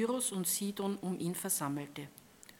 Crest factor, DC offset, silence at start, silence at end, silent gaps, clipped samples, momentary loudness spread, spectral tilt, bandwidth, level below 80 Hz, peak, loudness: 16 dB; under 0.1%; 0 s; 0.05 s; none; under 0.1%; 15 LU; -4 dB/octave; 18 kHz; -78 dBFS; -20 dBFS; -35 LUFS